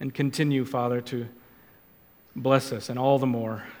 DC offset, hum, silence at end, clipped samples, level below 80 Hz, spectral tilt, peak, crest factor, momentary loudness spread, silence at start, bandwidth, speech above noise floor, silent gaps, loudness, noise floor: under 0.1%; none; 0 s; under 0.1%; -68 dBFS; -6.5 dB/octave; -6 dBFS; 22 dB; 11 LU; 0 s; 18 kHz; 31 dB; none; -26 LUFS; -57 dBFS